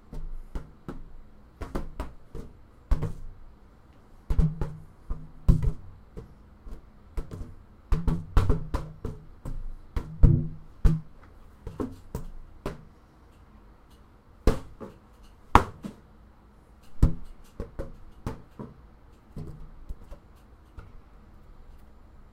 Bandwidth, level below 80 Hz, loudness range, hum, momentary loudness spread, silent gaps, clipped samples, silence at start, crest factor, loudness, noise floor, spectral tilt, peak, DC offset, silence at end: 12.5 kHz; -32 dBFS; 14 LU; none; 23 LU; none; under 0.1%; 0.15 s; 30 dB; -31 LUFS; -54 dBFS; -7.5 dB/octave; 0 dBFS; under 0.1%; 0.4 s